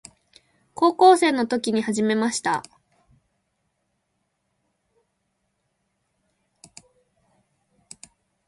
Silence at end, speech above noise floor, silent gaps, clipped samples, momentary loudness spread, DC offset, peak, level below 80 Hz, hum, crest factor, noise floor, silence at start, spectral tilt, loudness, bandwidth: 5.85 s; 55 dB; none; under 0.1%; 11 LU; under 0.1%; -4 dBFS; -70 dBFS; none; 22 dB; -75 dBFS; 0.75 s; -4 dB/octave; -20 LUFS; 11.5 kHz